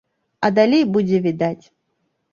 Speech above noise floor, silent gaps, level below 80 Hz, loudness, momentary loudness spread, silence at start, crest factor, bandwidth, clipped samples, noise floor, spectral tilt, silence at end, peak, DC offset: 54 dB; none; -62 dBFS; -18 LUFS; 9 LU; 0.4 s; 18 dB; 7.2 kHz; under 0.1%; -71 dBFS; -7.5 dB/octave; 0.8 s; -2 dBFS; under 0.1%